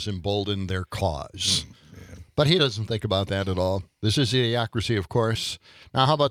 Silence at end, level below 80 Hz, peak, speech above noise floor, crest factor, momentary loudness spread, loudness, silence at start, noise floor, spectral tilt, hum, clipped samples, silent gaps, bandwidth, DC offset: 0 s; -50 dBFS; -4 dBFS; 20 dB; 20 dB; 8 LU; -25 LUFS; 0 s; -45 dBFS; -5 dB/octave; none; under 0.1%; none; 15.5 kHz; under 0.1%